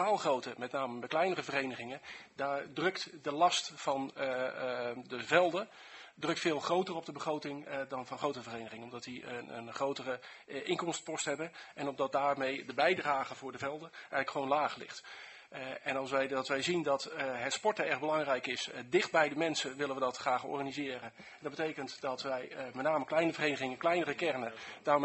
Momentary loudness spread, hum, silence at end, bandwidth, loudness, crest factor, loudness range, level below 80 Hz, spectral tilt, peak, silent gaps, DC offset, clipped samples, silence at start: 13 LU; none; 0 s; 8.2 kHz; -35 LUFS; 24 dB; 6 LU; -78 dBFS; -3.5 dB/octave; -10 dBFS; none; under 0.1%; under 0.1%; 0 s